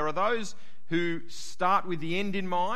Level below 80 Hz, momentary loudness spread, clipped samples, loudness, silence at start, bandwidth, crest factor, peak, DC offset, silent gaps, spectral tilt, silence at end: -66 dBFS; 10 LU; under 0.1%; -30 LUFS; 0 s; 13 kHz; 18 dB; -12 dBFS; 3%; none; -5 dB/octave; 0 s